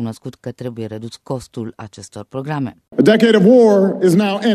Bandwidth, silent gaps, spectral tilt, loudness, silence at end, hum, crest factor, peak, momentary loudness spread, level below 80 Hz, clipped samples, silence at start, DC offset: 14 kHz; none; -6.5 dB/octave; -13 LUFS; 0 s; none; 16 dB; 0 dBFS; 21 LU; -58 dBFS; under 0.1%; 0 s; under 0.1%